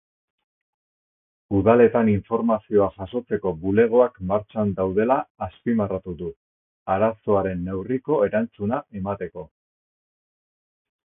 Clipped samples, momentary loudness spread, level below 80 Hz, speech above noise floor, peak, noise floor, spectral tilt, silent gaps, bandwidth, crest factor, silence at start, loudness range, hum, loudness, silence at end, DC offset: under 0.1%; 14 LU; -48 dBFS; over 68 dB; -4 dBFS; under -90 dBFS; -12.5 dB/octave; 5.30-5.35 s, 6.36-6.86 s; 3.8 kHz; 20 dB; 1.5 s; 6 LU; none; -22 LUFS; 1.6 s; under 0.1%